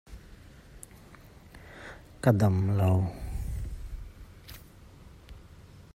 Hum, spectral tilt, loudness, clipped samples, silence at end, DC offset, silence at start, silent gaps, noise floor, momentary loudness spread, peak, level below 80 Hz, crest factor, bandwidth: none; -8 dB/octave; -28 LUFS; under 0.1%; 0.15 s; under 0.1%; 0.1 s; none; -52 dBFS; 27 LU; -8 dBFS; -44 dBFS; 24 dB; 15 kHz